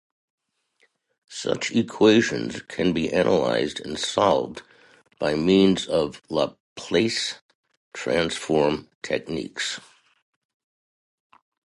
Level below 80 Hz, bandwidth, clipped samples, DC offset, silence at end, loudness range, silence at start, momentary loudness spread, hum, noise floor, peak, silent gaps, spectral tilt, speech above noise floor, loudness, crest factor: -56 dBFS; 11.5 kHz; under 0.1%; under 0.1%; 1.85 s; 5 LU; 1.3 s; 13 LU; none; -67 dBFS; -4 dBFS; 6.60-6.76 s, 7.42-7.49 s, 7.55-7.64 s, 7.77-7.91 s, 8.95-9.01 s; -4.5 dB/octave; 44 dB; -23 LUFS; 20 dB